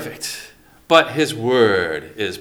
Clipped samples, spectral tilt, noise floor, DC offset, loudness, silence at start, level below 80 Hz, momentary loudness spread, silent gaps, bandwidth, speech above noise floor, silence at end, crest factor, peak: under 0.1%; -4 dB/octave; -43 dBFS; under 0.1%; -18 LUFS; 0 s; -56 dBFS; 13 LU; none; 20 kHz; 26 dB; 0 s; 20 dB; 0 dBFS